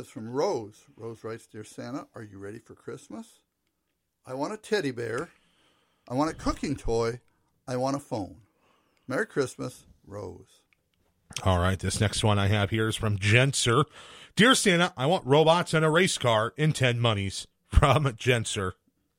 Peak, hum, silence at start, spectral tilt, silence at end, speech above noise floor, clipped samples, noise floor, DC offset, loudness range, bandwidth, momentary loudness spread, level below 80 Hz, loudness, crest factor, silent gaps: -6 dBFS; none; 0 s; -4.5 dB/octave; 0.45 s; 53 dB; under 0.1%; -79 dBFS; under 0.1%; 13 LU; 16 kHz; 21 LU; -42 dBFS; -26 LUFS; 22 dB; none